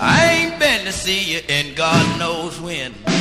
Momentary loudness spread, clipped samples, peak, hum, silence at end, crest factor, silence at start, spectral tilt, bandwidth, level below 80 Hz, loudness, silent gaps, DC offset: 11 LU; under 0.1%; -2 dBFS; none; 0 s; 16 dB; 0 s; -3.5 dB/octave; 15 kHz; -42 dBFS; -17 LUFS; none; under 0.1%